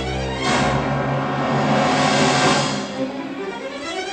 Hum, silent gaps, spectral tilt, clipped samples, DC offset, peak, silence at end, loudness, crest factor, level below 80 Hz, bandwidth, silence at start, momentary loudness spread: none; none; -4.5 dB/octave; under 0.1%; under 0.1%; -4 dBFS; 0 s; -20 LUFS; 16 dB; -40 dBFS; 9.6 kHz; 0 s; 12 LU